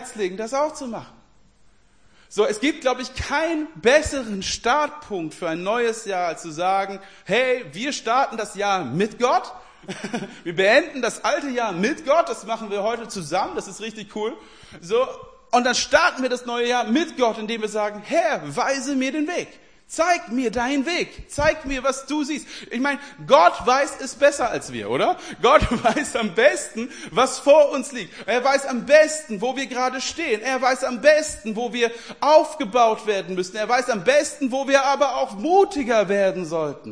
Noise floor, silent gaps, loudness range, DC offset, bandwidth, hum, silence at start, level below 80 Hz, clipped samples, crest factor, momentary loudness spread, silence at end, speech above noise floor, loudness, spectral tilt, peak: -58 dBFS; none; 5 LU; 0.2%; 10.5 kHz; none; 0 s; -46 dBFS; under 0.1%; 22 dB; 12 LU; 0 s; 36 dB; -21 LUFS; -3.5 dB/octave; 0 dBFS